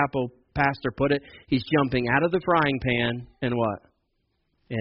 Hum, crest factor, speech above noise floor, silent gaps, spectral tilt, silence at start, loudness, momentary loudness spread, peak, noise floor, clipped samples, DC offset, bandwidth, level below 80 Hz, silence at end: none; 18 dB; 49 dB; none; -4.5 dB/octave; 0 s; -25 LUFS; 8 LU; -8 dBFS; -73 dBFS; under 0.1%; under 0.1%; 5.8 kHz; -48 dBFS; 0 s